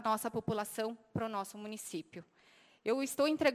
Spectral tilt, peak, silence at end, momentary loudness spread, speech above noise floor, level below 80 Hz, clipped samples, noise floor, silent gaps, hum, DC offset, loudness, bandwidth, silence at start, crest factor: -4.5 dB/octave; -16 dBFS; 0 s; 12 LU; 30 dB; -68 dBFS; under 0.1%; -65 dBFS; none; none; under 0.1%; -37 LUFS; 16 kHz; 0 s; 20 dB